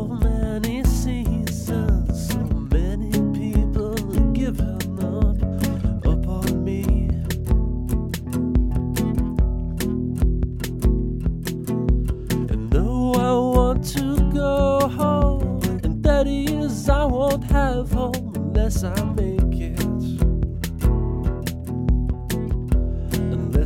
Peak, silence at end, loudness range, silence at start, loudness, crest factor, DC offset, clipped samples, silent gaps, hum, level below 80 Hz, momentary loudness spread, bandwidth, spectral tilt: -4 dBFS; 0 s; 3 LU; 0 s; -22 LUFS; 16 dB; under 0.1%; under 0.1%; none; none; -24 dBFS; 6 LU; 16.5 kHz; -7 dB/octave